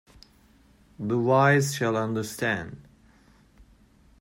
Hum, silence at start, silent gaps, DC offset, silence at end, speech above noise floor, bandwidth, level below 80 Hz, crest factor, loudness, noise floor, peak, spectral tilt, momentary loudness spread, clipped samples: none; 1 s; none; under 0.1%; 1.4 s; 34 dB; 16 kHz; -60 dBFS; 20 dB; -25 LUFS; -58 dBFS; -8 dBFS; -5.5 dB/octave; 13 LU; under 0.1%